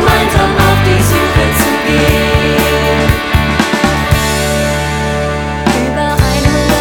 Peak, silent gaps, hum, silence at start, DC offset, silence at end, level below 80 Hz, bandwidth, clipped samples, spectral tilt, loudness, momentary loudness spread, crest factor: 0 dBFS; none; none; 0 s; under 0.1%; 0 s; -20 dBFS; over 20 kHz; 0.2%; -5 dB/octave; -11 LUFS; 5 LU; 10 dB